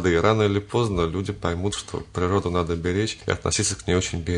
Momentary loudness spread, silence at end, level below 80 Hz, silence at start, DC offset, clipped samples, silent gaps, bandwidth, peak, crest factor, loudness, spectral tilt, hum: 7 LU; 0 s; -44 dBFS; 0 s; under 0.1%; under 0.1%; none; 11 kHz; -4 dBFS; 20 dB; -24 LUFS; -5 dB/octave; none